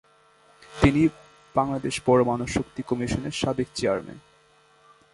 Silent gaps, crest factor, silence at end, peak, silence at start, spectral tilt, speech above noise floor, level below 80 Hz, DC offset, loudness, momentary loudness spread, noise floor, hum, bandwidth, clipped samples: none; 22 dB; 0.95 s; -4 dBFS; 0.7 s; -6 dB/octave; 34 dB; -44 dBFS; under 0.1%; -25 LUFS; 9 LU; -59 dBFS; none; 11.5 kHz; under 0.1%